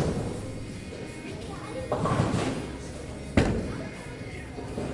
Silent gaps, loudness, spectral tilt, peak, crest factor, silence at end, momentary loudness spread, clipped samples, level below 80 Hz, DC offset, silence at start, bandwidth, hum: none; -32 LUFS; -6 dB/octave; -6 dBFS; 24 dB; 0 s; 12 LU; under 0.1%; -42 dBFS; under 0.1%; 0 s; 11.5 kHz; none